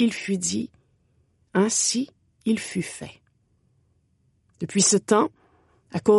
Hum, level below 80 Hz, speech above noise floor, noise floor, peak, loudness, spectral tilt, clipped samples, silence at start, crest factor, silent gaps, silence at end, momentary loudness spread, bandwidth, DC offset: none; -68 dBFS; 44 dB; -66 dBFS; -6 dBFS; -24 LUFS; -3.5 dB/octave; under 0.1%; 0 s; 20 dB; none; 0 s; 16 LU; 11.5 kHz; under 0.1%